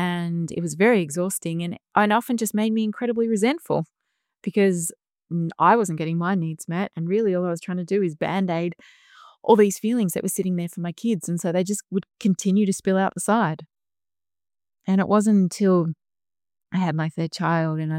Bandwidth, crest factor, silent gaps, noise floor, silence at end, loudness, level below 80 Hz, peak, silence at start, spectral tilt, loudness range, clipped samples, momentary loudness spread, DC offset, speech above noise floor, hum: 16.5 kHz; 18 dB; none; under -90 dBFS; 0 s; -23 LUFS; -68 dBFS; -4 dBFS; 0 s; -6 dB/octave; 2 LU; under 0.1%; 9 LU; under 0.1%; over 68 dB; none